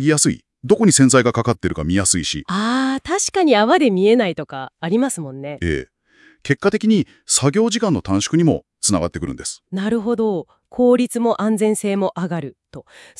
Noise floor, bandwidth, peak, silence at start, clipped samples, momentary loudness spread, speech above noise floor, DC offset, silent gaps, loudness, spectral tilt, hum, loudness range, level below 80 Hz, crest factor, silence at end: -53 dBFS; 12 kHz; -2 dBFS; 0 s; under 0.1%; 13 LU; 35 dB; under 0.1%; none; -18 LUFS; -4.5 dB/octave; none; 3 LU; -46 dBFS; 16 dB; 0.4 s